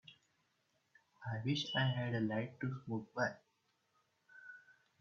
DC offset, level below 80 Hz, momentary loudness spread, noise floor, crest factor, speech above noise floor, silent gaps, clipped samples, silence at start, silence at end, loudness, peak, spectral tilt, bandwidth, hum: under 0.1%; -78 dBFS; 21 LU; -80 dBFS; 20 dB; 42 dB; none; under 0.1%; 0.1 s; 0.3 s; -39 LUFS; -22 dBFS; -4.5 dB/octave; 7.2 kHz; none